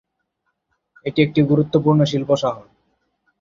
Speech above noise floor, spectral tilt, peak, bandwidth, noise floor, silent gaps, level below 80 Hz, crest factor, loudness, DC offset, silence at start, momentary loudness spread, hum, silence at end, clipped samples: 56 dB; -7.5 dB/octave; -2 dBFS; 7.6 kHz; -73 dBFS; none; -56 dBFS; 18 dB; -18 LUFS; under 0.1%; 1.05 s; 10 LU; none; 0.8 s; under 0.1%